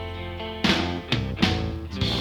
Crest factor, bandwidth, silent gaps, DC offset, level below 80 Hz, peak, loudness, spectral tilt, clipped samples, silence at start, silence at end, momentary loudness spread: 22 dB; 18 kHz; none; under 0.1%; -38 dBFS; -4 dBFS; -25 LUFS; -5 dB/octave; under 0.1%; 0 s; 0 s; 10 LU